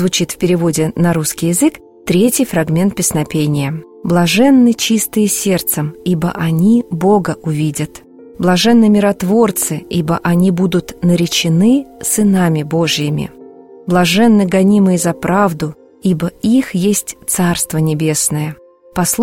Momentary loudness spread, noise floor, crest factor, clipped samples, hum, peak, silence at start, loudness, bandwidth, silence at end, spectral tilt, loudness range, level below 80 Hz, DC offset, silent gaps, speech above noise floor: 8 LU; -37 dBFS; 12 dB; under 0.1%; none; 0 dBFS; 0 s; -13 LUFS; 16.5 kHz; 0 s; -5 dB/octave; 2 LU; -44 dBFS; 0.4%; none; 24 dB